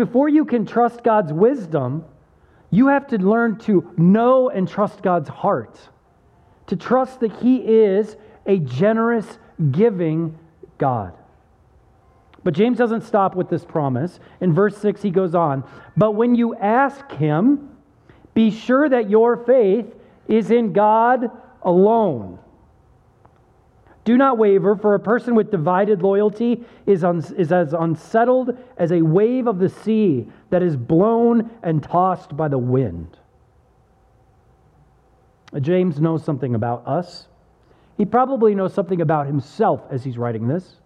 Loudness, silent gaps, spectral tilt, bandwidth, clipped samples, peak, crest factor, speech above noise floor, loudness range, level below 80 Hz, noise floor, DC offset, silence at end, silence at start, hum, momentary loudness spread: -18 LUFS; none; -9 dB/octave; 9.4 kHz; under 0.1%; -4 dBFS; 14 dB; 38 dB; 6 LU; -58 dBFS; -56 dBFS; under 0.1%; 0.25 s; 0 s; none; 10 LU